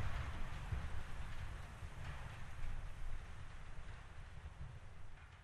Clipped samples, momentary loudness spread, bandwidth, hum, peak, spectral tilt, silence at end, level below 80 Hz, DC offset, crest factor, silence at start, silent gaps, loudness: under 0.1%; 9 LU; 11.5 kHz; none; -30 dBFS; -5.5 dB/octave; 0 s; -48 dBFS; under 0.1%; 16 dB; 0 s; none; -51 LUFS